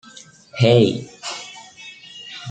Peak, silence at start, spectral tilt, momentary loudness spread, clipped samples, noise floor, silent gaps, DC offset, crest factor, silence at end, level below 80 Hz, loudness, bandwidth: -2 dBFS; 0.55 s; -6 dB/octave; 23 LU; under 0.1%; -45 dBFS; none; under 0.1%; 20 dB; 0 s; -58 dBFS; -18 LUFS; 9.2 kHz